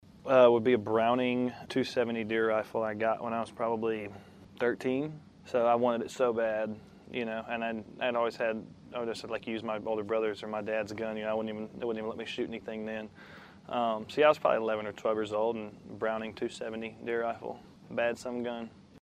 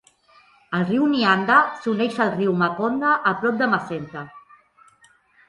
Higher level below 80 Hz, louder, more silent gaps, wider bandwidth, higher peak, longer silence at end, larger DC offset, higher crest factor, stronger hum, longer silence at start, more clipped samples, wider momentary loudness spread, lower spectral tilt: about the same, -70 dBFS vs -66 dBFS; second, -32 LUFS vs -20 LUFS; neither; first, 13 kHz vs 11 kHz; second, -10 dBFS vs -4 dBFS; second, 0.05 s vs 1.1 s; neither; about the same, 22 dB vs 20 dB; neither; second, 0.15 s vs 0.7 s; neither; about the same, 13 LU vs 14 LU; about the same, -6 dB/octave vs -6.5 dB/octave